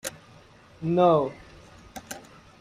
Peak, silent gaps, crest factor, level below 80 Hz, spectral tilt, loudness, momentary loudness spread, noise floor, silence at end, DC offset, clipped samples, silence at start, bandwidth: -8 dBFS; none; 20 dB; -58 dBFS; -6 dB/octave; -24 LUFS; 24 LU; -52 dBFS; 0.4 s; under 0.1%; under 0.1%; 0.05 s; 16 kHz